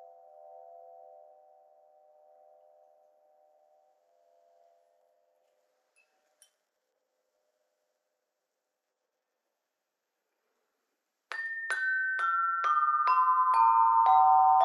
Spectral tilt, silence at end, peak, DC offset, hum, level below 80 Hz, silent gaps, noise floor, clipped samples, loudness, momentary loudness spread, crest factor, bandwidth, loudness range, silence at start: 1.5 dB/octave; 0 s; -12 dBFS; under 0.1%; none; under -90 dBFS; none; -86 dBFS; under 0.1%; -25 LUFS; 13 LU; 20 dB; 10.5 kHz; 18 LU; 11.3 s